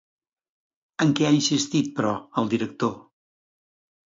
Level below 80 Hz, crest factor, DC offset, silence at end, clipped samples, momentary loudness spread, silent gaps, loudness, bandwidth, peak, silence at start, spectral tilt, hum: -66 dBFS; 18 dB; under 0.1%; 1.15 s; under 0.1%; 8 LU; none; -24 LUFS; 7.8 kHz; -8 dBFS; 1 s; -4.5 dB/octave; none